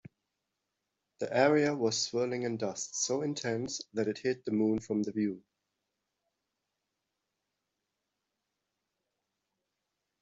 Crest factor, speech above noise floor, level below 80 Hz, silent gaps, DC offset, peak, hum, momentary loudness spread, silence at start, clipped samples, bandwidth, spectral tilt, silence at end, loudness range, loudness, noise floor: 24 dB; 54 dB; -72 dBFS; none; under 0.1%; -12 dBFS; none; 9 LU; 1.2 s; under 0.1%; 8.2 kHz; -4 dB/octave; 4.8 s; 8 LU; -32 LUFS; -86 dBFS